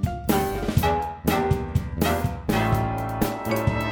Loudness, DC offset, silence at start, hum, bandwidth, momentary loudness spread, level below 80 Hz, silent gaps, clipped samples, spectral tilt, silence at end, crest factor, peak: -24 LUFS; under 0.1%; 0 s; none; over 20 kHz; 4 LU; -36 dBFS; none; under 0.1%; -6 dB/octave; 0 s; 16 dB; -6 dBFS